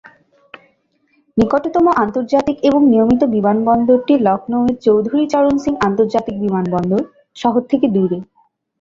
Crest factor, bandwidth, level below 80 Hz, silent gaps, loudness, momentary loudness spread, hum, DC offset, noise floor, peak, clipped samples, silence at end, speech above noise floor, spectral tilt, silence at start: 14 dB; 7.6 kHz; -46 dBFS; none; -15 LUFS; 6 LU; none; under 0.1%; -60 dBFS; -2 dBFS; under 0.1%; 0.55 s; 46 dB; -8 dB/octave; 1.35 s